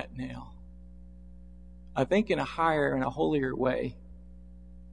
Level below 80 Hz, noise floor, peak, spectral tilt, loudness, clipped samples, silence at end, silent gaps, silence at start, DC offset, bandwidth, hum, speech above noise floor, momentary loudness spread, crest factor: -50 dBFS; -50 dBFS; -12 dBFS; -7 dB/octave; -29 LUFS; under 0.1%; 0 s; none; 0 s; 0.2%; 10.5 kHz; 60 Hz at -50 dBFS; 21 dB; 15 LU; 20 dB